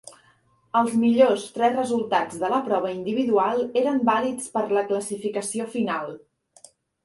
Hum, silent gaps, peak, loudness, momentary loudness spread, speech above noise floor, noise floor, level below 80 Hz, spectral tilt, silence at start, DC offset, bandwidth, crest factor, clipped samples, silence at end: none; none; -6 dBFS; -23 LUFS; 8 LU; 39 dB; -61 dBFS; -68 dBFS; -4.5 dB/octave; 0.05 s; under 0.1%; 11.5 kHz; 18 dB; under 0.1%; 0.85 s